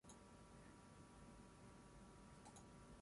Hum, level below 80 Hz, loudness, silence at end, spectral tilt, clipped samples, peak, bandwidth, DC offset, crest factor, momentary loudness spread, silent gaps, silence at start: none; -72 dBFS; -64 LUFS; 0 s; -5 dB/octave; under 0.1%; -48 dBFS; 11.5 kHz; under 0.1%; 14 dB; 2 LU; none; 0.05 s